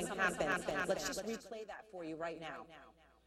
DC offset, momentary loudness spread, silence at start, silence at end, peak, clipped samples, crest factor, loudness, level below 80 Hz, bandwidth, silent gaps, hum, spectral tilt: under 0.1%; 15 LU; 0 s; 0.35 s; -20 dBFS; under 0.1%; 20 dB; -40 LUFS; -66 dBFS; 16 kHz; none; none; -3.5 dB/octave